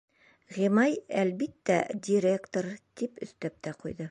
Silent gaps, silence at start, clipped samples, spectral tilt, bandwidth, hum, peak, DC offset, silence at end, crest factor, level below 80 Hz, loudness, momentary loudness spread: none; 0.5 s; under 0.1%; -6 dB/octave; 11 kHz; none; -12 dBFS; under 0.1%; 0 s; 18 dB; -68 dBFS; -30 LUFS; 13 LU